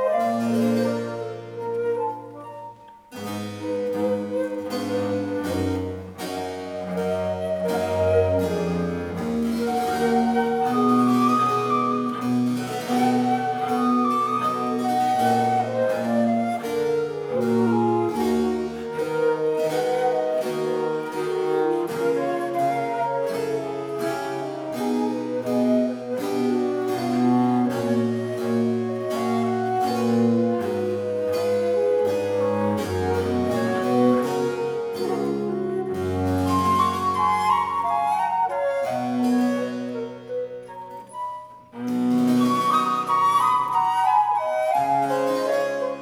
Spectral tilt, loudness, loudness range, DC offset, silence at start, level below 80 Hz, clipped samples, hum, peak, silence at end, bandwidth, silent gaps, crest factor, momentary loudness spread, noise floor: -6.5 dB/octave; -23 LUFS; 5 LU; under 0.1%; 0 s; -58 dBFS; under 0.1%; none; -8 dBFS; 0 s; 17 kHz; none; 14 dB; 10 LU; -43 dBFS